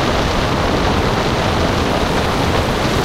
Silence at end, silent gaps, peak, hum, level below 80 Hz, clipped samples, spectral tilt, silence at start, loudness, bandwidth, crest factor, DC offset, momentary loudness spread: 0 s; none; -2 dBFS; none; -26 dBFS; under 0.1%; -5 dB/octave; 0 s; -16 LUFS; 16 kHz; 14 dB; under 0.1%; 1 LU